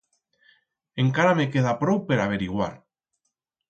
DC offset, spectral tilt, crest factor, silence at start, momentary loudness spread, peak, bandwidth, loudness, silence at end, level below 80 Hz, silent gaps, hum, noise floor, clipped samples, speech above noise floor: under 0.1%; -7 dB/octave; 18 dB; 0.95 s; 9 LU; -6 dBFS; 8 kHz; -23 LUFS; 0.95 s; -56 dBFS; none; none; -79 dBFS; under 0.1%; 57 dB